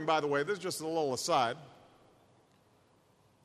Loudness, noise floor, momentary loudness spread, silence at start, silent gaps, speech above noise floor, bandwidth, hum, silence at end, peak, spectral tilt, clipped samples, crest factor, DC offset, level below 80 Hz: -32 LUFS; -67 dBFS; 5 LU; 0 s; none; 35 dB; 13 kHz; none; 1.75 s; -16 dBFS; -3.5 dB/octave; under 0.1%; 20 dB; under 0.1%; -76 dBFS